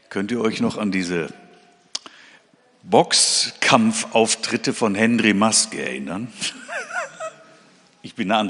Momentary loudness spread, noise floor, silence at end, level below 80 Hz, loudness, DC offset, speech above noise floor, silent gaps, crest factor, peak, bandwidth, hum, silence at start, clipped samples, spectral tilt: 16 LU; -55 dBFS; 0 s; -66 dBFS; -19 LUFS; under 0.1%; 35 dB; none; 22 dB; 0 dBFS; 11 kHz; none; 0.1 s; under 0.1%; -3 dB/octave